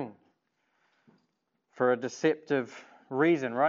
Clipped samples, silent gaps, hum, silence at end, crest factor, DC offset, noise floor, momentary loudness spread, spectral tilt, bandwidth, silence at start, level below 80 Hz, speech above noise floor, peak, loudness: under 0.1%; none; none; 0 s; 18 dB; under 0.1%; -78 dBFS; 16 LU; -5 dB/octave; 7.6 kHz; 0 s; -88 dBFS; 50 dB; -12 dBFS; -29 LUFS